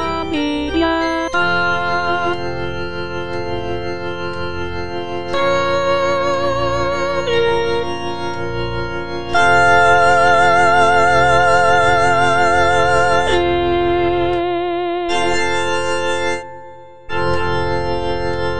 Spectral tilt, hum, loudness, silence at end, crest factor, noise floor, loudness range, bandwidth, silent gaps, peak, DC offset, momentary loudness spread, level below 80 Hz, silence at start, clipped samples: -5 dB/octave; none; -16 LUFS; 0 s; 16 dB; -38 dBFS; 8 LU; 10 kHz; none; 0 dBFS; 5%; 12 LU; -36 dBFS; 0 s; under 0.1%